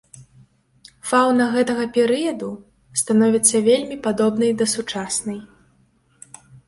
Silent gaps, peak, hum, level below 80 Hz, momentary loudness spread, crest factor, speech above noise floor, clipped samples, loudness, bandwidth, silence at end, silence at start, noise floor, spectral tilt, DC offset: none; -2 dBFS; none; -60 dBFS; 15 LU; 20 dB; 41 dB; under 0.1%; -19 LUFS; 12 kHz; 1.25 s; 0.15 s; -60 dBFS; -3.5 dB/octave; under 0.1%